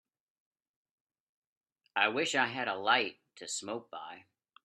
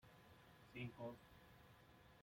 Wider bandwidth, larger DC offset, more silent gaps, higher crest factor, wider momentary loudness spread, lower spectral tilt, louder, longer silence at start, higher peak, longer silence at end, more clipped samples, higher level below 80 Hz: second, 12.5 kHz vs 16.5 kHz; neither; neither; first, 26 dB vs 20 dB; about the same, 17 LU vs 15 LU; second, -2 dB/octave vs -6.5 dB/octave; first, -32 LUFS vs -59 LUFS; first, 1.95 s vs 0 s; first, -12 dBFS vs -38 dBFS; first, 0.45 s vs 0 s; neither; second, -84 dBFS vs -78 dBFS